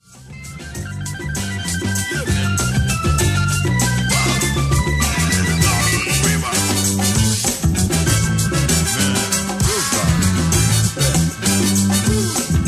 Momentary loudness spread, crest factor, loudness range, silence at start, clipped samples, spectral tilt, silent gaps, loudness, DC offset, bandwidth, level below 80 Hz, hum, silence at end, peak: 7 LU; 14 dB; 3 LU; 0.15 s; under 0.1%; -4 dB/octave; none; -17 LUFS; under 0.1%; 16 kHz; -28 dBFS; none; 0 s; -2 dBFS